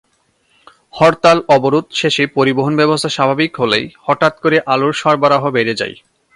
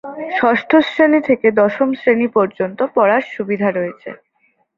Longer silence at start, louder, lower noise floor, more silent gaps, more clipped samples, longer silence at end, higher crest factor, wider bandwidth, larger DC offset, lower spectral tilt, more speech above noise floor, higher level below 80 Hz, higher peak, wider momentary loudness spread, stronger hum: first, 0.95 s vs 0.05 s; about the same, -14 LUFS vs -15 LUFS; about the same, -60 dBFS vs -62 dBFS; neither; neither; second, 0.45 s vs 0.65 s; about the same, 14 dB vs 16 dB; first, 11.5 kHz vs 7.2 kHz; neither; second, -5 dB/octave vs -7.5 dB/octave; about the same, 46 dB vs 47 dB; first, -54 dBFS vs -60 dBFS; about the same, 0 dBFS vs 0 dBFS; second, 5 LU vs 10 LU; neither